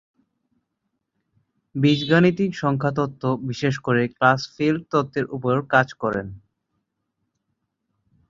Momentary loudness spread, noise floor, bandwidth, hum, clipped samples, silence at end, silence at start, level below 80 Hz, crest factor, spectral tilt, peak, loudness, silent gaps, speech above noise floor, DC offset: 9 LU; -77 dBFS; 7.6 kHz; none; under 0.1%; 1.9 s; 1.75 s; -58 dBFS; 22 dB; -7 dB/octave; -2 dBFS; -21 LUFS; none; 56 dB; under 0.1%